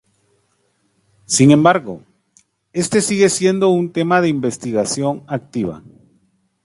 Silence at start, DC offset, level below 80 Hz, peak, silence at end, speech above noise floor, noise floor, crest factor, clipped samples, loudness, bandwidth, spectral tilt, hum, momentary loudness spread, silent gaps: 1.3 s; under 0.1%; -56 dBFS; 0 dBFS; 0.85 s; 48 dB; -64 dBFS; 18 dB; under 0.1%; -16 LUFS; 11.5 kHz; -5 dB/octave; none; 14 LU; none